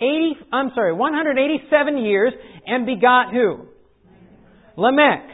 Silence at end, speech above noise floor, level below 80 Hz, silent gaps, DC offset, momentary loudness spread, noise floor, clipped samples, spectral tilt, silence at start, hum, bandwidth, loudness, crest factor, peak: 0 s; 33 dB; -60 dBFS; none; under 0.1%; 8 LU; -51 dBFS; under 0.1%; -10 dB/octave; 0 s; none; 4 kHz; -18 LUFS; 18 dB; -2 dBFS